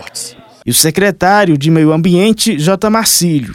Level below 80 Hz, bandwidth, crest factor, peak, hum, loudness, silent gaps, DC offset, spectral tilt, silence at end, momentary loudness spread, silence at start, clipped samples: -44 dBFS; over 20 kHz; 10 dB; 0 dBFS; none; -10 LUFS; none; under 0.1%; -4 dB/octave; 0 s; 14 LU; 0 s; 0.1%